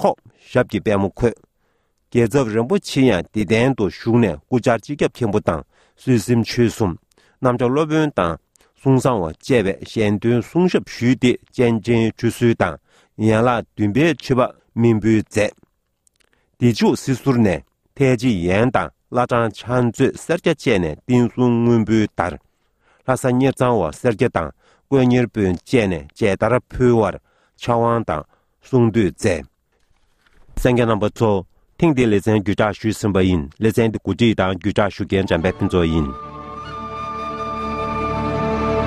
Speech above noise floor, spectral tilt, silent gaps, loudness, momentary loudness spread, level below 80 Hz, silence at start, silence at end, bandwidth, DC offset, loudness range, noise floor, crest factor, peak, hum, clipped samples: 48 dB; -7 dB/octave; none; -19 LUFS; 7 LU; -40 dBFS; 0 s; 0 s; 14 kHz; under 0.1%; 2 LU; -65 dBFS; 18 dB; 0 dBFS; none; under 0.1%